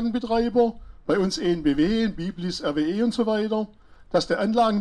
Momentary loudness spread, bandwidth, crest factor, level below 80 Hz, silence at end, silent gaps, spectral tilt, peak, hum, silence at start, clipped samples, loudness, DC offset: 7 LU; 11 kHz; 14 dB; -46 dBFS; 0 s; none; -6 dB/octave; -8 dBFS; none; 0 s; under 0.1%; -24 LUFS; under 0.1%